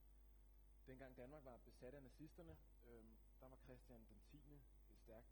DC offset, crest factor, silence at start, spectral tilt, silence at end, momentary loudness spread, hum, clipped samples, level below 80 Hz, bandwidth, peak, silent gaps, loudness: under 0.1%; 18 dB; 0 s; -7 dB/octave; 0 s; 7 LU; none; under 0.1%; -70 dBFS; 18 kHz; -46 dBFS; none; -65 LUFS